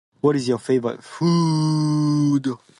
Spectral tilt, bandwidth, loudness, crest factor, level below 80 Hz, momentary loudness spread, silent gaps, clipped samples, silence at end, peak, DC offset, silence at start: -7 dB/octave; 11.5 kHz; -21 LUFS; 16 dB; -62 dBFS; 4 LU; none; under 0.1%; 0.25 s; -4 dBFS; under 0.1%; 0.25 s